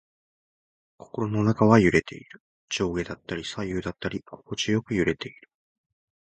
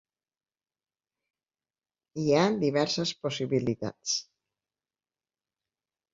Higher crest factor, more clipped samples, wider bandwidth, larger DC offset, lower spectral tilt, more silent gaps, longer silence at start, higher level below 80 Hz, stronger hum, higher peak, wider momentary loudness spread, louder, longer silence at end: about the same, 24 dB vs 22 dB; neither; first, 8.8 kHz vs 7.8 kHz; neither; first, -6 dB/octave vs -4.5 dB/octave; first, 2.40-2.68 s vs none; second, 1.15 s vs 2.15 s; first, -50 dBFS vs -70 dBFS; neither; first, -2 dBFS vs -10 dBFS; first, 18 LU vs 8 LU; first, -25 LUFS vs -28 LUFS; second, 0.9 s vs 1.9 s